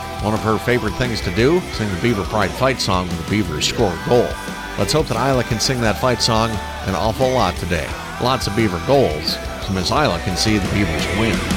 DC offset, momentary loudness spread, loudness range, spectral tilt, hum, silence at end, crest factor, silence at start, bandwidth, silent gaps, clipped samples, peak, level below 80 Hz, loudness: under 0.1%; 6 LU; 1 LU; -4.5 dB/octave; none; 0 s; 16 dB; 0 s; 17 kHz; none; under 0.1%; -2 dBFS; -32 dBFS; -18 LUFS